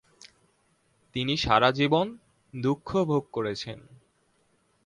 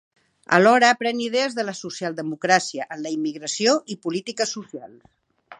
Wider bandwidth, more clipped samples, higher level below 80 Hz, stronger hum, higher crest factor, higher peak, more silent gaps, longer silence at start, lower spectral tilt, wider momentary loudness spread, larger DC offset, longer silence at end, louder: about the same, 11 kHz vs 11 kHz; neither; first, -54 dBFS vs -74 dBFS; neither; about the same, 22 dB vs 22 dB; second, -8 dBFS vs -2 dBFS; neither; second, 0.25 s vs 0.5 s; first, -6 dB/octave vs -3.5 dB/octave; about the same, 16 LU vs 14 LU; neither; first, 1.05 s vs 0.05 s; second, -26 LUFS vs -21 LUFS